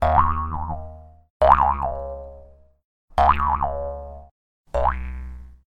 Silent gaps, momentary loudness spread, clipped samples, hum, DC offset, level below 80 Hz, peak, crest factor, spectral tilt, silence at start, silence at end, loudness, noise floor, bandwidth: 1.30-1.40 s, 2.84-3.08 s, 4.31-4.64 s; 20 LU; under 0.1%; none; under 0.1%; -32 dBFS; 0 dBFS; 22 dB; -7.5 dB/octave; 0 s; 0.15 s; -22 LUFS; -47 dBFS; 8.6 kHz